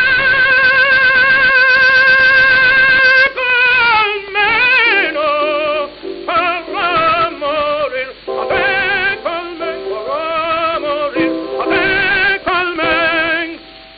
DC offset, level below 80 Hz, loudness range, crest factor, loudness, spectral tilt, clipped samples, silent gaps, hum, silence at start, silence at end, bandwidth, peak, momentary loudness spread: under 0.1%; -44 dBFS; 9 LU; 14 dB; -11 LUFS; -5 dB/octave; under 0.1%; none; none; 0 s; 0.1 s; 6 kHz; 0 dBFS; 12 LU